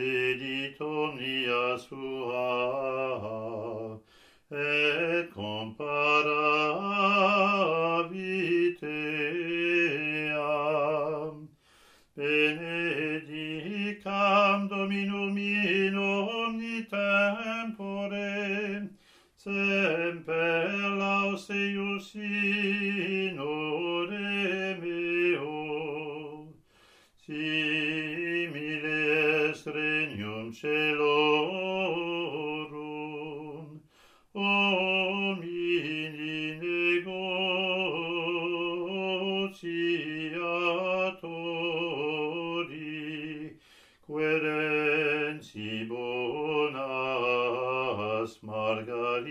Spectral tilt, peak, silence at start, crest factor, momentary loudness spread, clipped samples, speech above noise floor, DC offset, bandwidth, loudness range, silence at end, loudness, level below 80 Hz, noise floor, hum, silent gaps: -5.5 dB/octave; -10 dBFS; 0 s; 20 dB; 11 LU; under 0.1%; 32 dB; under 0.1%; 13 kHz; 5 LU; 0 s; -29 LUFS; -72 dBFS; -61 dBFS; none; none